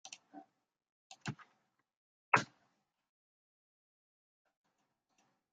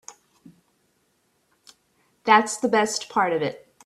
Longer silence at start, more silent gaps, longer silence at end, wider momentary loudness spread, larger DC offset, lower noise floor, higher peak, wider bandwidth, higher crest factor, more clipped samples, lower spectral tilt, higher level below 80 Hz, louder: about the same, 0.05 s vs 0.1 s; first, 0.89-1.10 s, 1.97-2.32 s vs none; first, 3.1 s vs 0.3 s; first, 25 LU vs 10 LU; neither; first, -83 dBFS vs -68 dBFS; second, -12 dBFS vs -2 dBFS; second, 9 kHz vs 13.5 kHz; first, 34 dB vs 24 dB; neither; about the same, -3.5 dB/octave vs -3 dB/octave; second, -86 dBFS vs -72 dBFS; second, -36 LUFS vs -22 LUFS